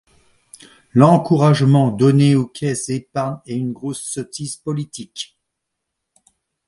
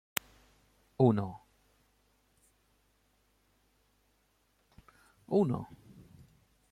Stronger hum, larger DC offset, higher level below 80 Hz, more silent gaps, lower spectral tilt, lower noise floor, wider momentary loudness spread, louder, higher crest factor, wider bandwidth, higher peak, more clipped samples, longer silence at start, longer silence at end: neither; neither; first, -58 dBFS vs -68 dBFS; neither; about the same, -6.5 dB/octave vs -6.5 dB/octave; first, -78 dBFS vs -73 dBFS; second, 16 LU vs 24 LU; first, -17 LUFS vs -32 LUFS; second, 18 dB vs 30 dB; second, 11.5 kHz vs 16.5 kHz; first, 0 dBFS vs -6 dBFS; neither; about the same, 0.95 s vs 1 s; first, 1.45 s vs 1.05 s